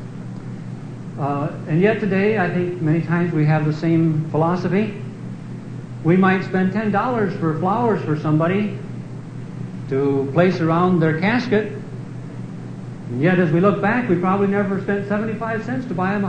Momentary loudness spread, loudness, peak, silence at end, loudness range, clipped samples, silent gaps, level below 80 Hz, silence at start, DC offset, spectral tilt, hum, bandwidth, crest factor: 15 LU; -19 LUFS; -2 dBFS; 0 s; 2 LU; under 0.1%; none; -52 dBFS; 0 s; under 0.1%; -8.5 dB/octave; none; 8.8 kHz; 18 dB